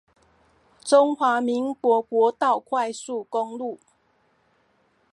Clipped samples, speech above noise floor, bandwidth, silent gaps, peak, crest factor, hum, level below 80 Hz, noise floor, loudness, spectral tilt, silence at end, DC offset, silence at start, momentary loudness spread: under 0.1%; 43 dB; 11.5 kHz; none; -4 dBFS; 20 dB; none; -76 dBFS; -65 dBFS; -23 LUFS; -3.5 dB/octave; 1.4 s; under 0.1%; 0.85 s; 14 LU